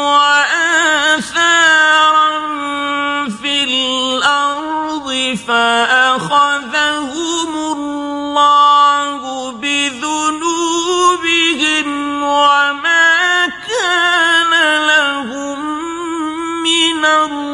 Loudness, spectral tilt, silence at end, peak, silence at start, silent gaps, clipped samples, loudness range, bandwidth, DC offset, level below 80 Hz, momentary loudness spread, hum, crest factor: -12 LUFS; -1 dB/octave; 0 s; 0 dBFS; 0 s; none; under 0.1%; 3 LU; 11.5 kHz; under 0.1%; -56 dBFS; 11 LU; none; 14 dB